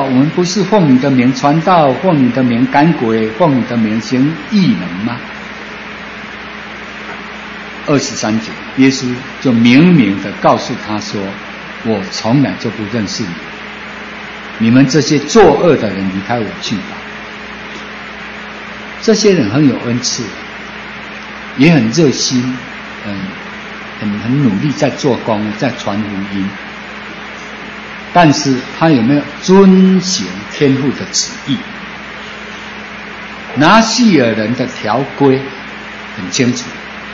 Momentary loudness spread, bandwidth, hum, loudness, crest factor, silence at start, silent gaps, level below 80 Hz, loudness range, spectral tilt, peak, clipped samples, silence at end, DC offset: 17 LU; 7.8 kHz; none; -12 LUFS; 14 dB; 0 s; none; -46 dBFS; 7 LU; -5.5 dB/octave; 0 dBFS; 0.1%; 0 s; under 0.1%